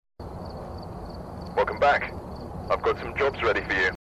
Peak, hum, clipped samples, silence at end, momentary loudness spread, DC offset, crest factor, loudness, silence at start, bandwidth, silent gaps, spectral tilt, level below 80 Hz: -10 dBFS; none; under 0.1%; 0.15 s; 16 LU; under 0.1%; 18 dB; -25 LUFS; 0.2 s; 13 kHz; none; -5.5 dB/octave; -44 dBFS